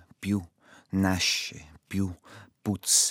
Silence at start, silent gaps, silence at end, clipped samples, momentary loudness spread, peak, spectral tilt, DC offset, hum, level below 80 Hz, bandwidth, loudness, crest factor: 0.2 s; none; 0 s; under 0.1%; 14 LU; -10 dBFS; -2.5 dB/octave; under 0.1%; none; -62 dBFS; 17.5 kHz; -28 LUFS; 20 dB